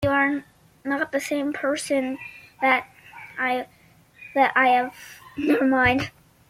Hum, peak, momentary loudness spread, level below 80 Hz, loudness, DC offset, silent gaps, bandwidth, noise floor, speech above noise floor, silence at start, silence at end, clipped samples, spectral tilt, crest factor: none; -6 dBFS; 19 LU; -54 dBFS; -23 LUFS; under 0.1%; none; 16 kHz; -50 dBFS; 28 dB; 0 s; 0.4 s; under 0.1%; -4.5 dB/octave; 18 dB